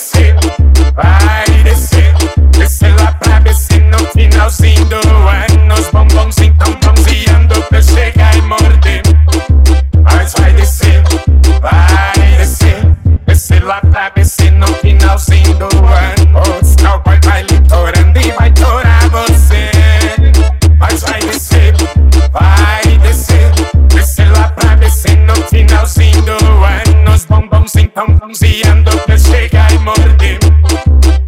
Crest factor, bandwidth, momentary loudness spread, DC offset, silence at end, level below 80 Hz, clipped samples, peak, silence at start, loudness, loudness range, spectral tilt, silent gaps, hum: 6 dB; 15.5 kHz; 1 LU; under 0.1%; 0 s; -8 dBFS; 1%; 0 dBFS; 0 s; -8 LUFS; 1 LU; -5.5 dB/octave; none; none